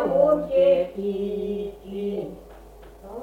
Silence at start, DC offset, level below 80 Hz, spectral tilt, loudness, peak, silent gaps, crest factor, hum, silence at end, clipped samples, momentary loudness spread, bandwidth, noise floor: 0 s; under 0.1%; -50 dBFS; -8 dB/octave; -24 LUFS; -8 dBFS; none; 16 dB; none; 0 s; under 0.1%; 17 LU; 4.8 kHz; -45 dBFS